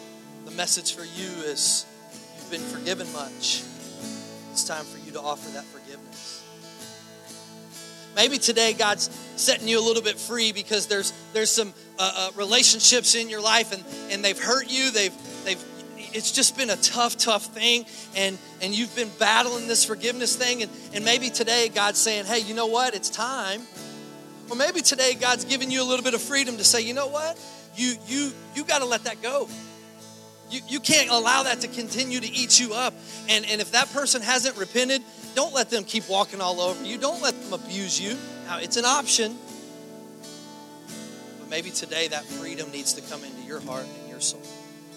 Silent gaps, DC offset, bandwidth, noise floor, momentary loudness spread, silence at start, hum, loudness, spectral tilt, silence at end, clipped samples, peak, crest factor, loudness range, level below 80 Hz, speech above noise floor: none; under 0.1%; 16.5 kHz; -46 dBFS; 21 LU; 0 s; none; -23 LUFS; -0.5 dB/octave; 0 s; under 0.1%; -2 dBFS; 24 dB; 10 LU; -76 dBFS; 21 dB